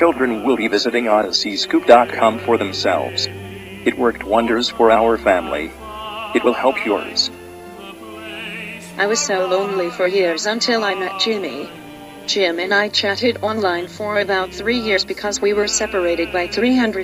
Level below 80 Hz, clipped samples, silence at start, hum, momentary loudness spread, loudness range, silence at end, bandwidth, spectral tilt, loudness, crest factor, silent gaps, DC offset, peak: -48 dBFS; under 0.1%; 0 s; none; 14 LU; 4 LU; 0 s; 15.5 kHz; -3 dB/octave; -18 LUFS; 18 dB; none; under 0.1%; 0 dBFS